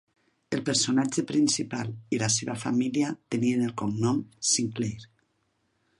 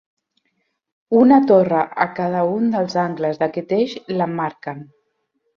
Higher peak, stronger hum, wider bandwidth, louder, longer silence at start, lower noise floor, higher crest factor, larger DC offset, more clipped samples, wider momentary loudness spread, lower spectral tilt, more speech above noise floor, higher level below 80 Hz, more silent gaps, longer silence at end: second, -10 dBFS vs -2 dBFS; neither; first, 11.5 kHz vs 7 kHz; second, -27 LUFS vs -18 LUFS; second, 0.5 s vs 1.1 s; about the same, -73 dBFS vs -70 dBFS; about the same, 18 dB vs 18 dB; neither; neither; second, 9 LU vs 12 LU; second, -4 dB/octave vs -8 dB/octave; second, 46 dB vs 53 dB; about the same, -64 dBFS vs -64 dBFS; neither; first, 0.95 s vs 0.7 s